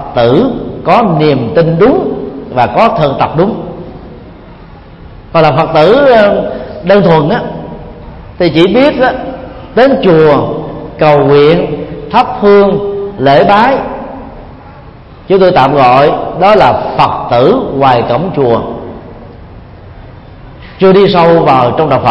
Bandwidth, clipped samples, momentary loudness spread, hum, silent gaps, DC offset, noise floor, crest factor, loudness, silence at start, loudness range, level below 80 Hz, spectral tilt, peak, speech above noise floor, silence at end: 7.4 kHz; 0.6%; 16 LU; none; none; under 0.1%; -31 dBFS; 8 dB; -8 LUFS; 0 s; 4 LU; -34 dBFS; -8.5 dB/octave; 0 dBFS; 25 dB; 0 s